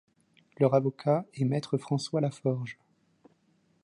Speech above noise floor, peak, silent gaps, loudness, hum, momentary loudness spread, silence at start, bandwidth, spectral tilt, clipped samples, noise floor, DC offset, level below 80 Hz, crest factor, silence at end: 41 dB; -12 dBFS; none; -29 LUFS; none; 7 LU; 0.6 s; 11 kHz; -7.5 dB/octave; under 0.1%; -69 dBFS; under 0.1%; -76 dBFS; 20 dB; 1.1 s